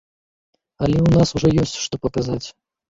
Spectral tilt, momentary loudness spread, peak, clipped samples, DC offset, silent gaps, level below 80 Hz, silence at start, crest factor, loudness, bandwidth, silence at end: -6.5 dB/octave; 10 LU; -2 dBFS; under 0.1%; under 0.1%; none; -38 dBFS; 0.8 s; 18 dB; -19 LUFS; 7.8 kHz; 0.45 s